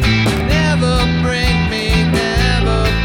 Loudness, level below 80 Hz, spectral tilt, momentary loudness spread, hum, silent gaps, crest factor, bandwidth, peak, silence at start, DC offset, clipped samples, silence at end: -14 LUFS; -20 dBFS; -5.5 dB/octave; 1 LU; none; none; 10 dB; 16.5 kHz; -4 dBFS; 0 s; under 0.1%; under 0.1%; 0 s